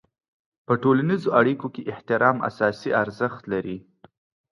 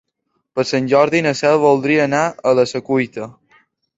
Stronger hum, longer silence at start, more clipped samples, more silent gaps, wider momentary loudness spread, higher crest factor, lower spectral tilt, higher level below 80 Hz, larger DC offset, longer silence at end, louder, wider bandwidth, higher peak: neither; first, 0.7 s vs 0.55 s; neither; neither; about the same, 11 LU vs 11 LU; about the same, 20 dB vs 16 dB; first, -8 dB/octave vs -5.5 dB/octave; about the same, -64 dBFS vs -60 dBFS; neither; about the same, 0.7 s vs 0.65 s; second, -23 LUFS vs -16 LUFS; first, 11 kHz vs 8 kHz; about the same, -4 dBFS vs -2 dBFS